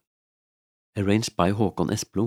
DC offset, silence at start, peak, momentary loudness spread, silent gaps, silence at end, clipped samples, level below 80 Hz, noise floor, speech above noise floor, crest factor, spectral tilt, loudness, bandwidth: under 0.1%; 0.95 s; -4 dBFS; 6 LU; none; 0 s; under 0.1%; -54 dBFS; under -90 dBFS; over 66 dB; 22 dB; -5.5 dB/octave; -25 LUFS; 15.5 kHz